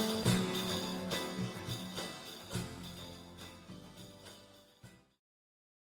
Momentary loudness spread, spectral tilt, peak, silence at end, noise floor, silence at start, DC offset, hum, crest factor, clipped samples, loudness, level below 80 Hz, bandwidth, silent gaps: 24 LU; -4.5 dB/octave; -18 dBFS; 0.95 s; -60 dBFS; 0 s; under 0.1%; none; 22 dB; under 0.1%; -38 LUFS; -64 dBFS; 19 kHz; none